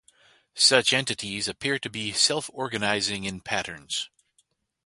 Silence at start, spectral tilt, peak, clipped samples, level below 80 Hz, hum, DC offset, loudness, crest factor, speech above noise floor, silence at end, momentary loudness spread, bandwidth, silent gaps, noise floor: 0.55 s; -1.5 dB/octave; -2 dBFS; under 0.1%; -62 dBFS; none; under 0.1%; -24 LUFS; 26 dB; 43 dB; 0.8 s; 12 LU; 11.5 kHz; none; -69 dBFS